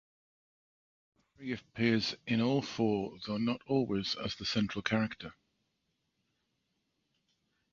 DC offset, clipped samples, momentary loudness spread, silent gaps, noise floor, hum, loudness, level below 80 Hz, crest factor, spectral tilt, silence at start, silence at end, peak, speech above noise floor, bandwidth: under 0.1%; under 0.1%; 11 LU; none; -81 dBFS; none; -33 LUFS; -64 dBFS; 22 dB; -5.5 dB/octave; 1.4 s; 2.4 s; -14 dBFS; 48 dB; 7.4 kHz